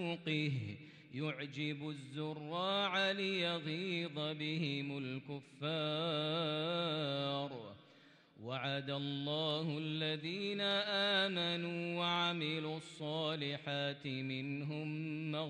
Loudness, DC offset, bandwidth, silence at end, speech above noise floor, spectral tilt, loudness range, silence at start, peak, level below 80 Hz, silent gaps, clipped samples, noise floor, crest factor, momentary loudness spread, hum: -38 LUFS; under 0.1%; 9.8 kHz; 0 s; 25 dB; -6 dB/octave; 4 LU; 0 s; -22 dBFS; -84 dBFS; none; under 0.1%; -64 dBFS; 16 dB; 10 LU; none